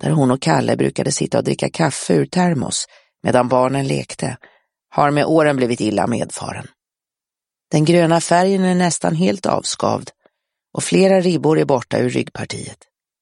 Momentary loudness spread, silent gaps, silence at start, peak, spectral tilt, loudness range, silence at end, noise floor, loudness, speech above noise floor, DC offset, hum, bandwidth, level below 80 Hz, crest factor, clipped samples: 12 LU; none; 0 s; 0 dBFS; -5.5 dB/octave; 2 LU; 0.5 s; -88 dBFS; -17 LUFS; 71 dB; under 0.1%; none; 11.5 kHz; -56 dBFS; 18 dB; under 0.1%